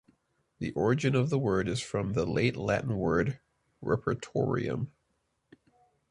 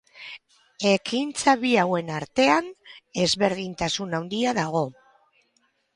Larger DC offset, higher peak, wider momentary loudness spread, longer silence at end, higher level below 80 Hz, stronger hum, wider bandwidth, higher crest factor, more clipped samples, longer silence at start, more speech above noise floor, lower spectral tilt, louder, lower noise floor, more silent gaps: neither; second, -12 dBFS vs -6 dBFS; second, 9 LU vs 16 LU; first, 1.2 s vs 1.05 s; first, -54 dBFS vs -60 dBFS; neither; about the same, 11.5 kHz vs 11.5 kHz; about the same, 20 dB vs 18 dB; neither; first, 0.6 s vs 0.15 s; about the same, 48 dB vs 45 dB; first, -6.5 dB/octave vs -4 dB/octave; second, -30 LUFS vs -24 LUFS; first, -77 dBFS vs -69 dBFS; neither